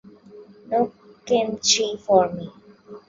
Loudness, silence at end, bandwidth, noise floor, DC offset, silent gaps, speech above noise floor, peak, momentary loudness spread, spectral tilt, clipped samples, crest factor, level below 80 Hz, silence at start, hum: -21 LUFS; 0.1 s; 7.8 kHz; -46 dBFS; under 0.1%; none; 25 dB; -4 dBFS; 10 LU; -2.5 dB/octave; under 0.1%; 20 dB; -62 dBFS; 0.35 s; none